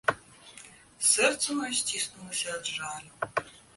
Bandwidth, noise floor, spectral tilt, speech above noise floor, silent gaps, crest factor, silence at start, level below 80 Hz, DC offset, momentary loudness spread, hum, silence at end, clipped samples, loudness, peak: 12 kHz; -52 dBFS; -0.5 dB/octave; 21 dB; none; 22 dB; 0.05 s; -68 dBFS; under 0.1%; 21 LU; none; 0.2 s; under 0.1%; -28 LUFS; -10 dBFS